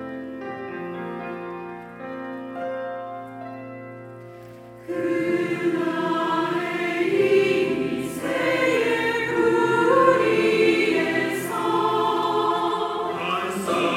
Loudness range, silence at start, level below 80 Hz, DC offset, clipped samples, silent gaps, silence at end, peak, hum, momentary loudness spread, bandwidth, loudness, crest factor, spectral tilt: 13 LU; 0 s; -68 dBFS; under 0.1%; under 0.1%; none; 0 s; -4 dBFS; none; 18 LU; 16 kHz; -22 LUFS; 18 dB; -5 dB/octave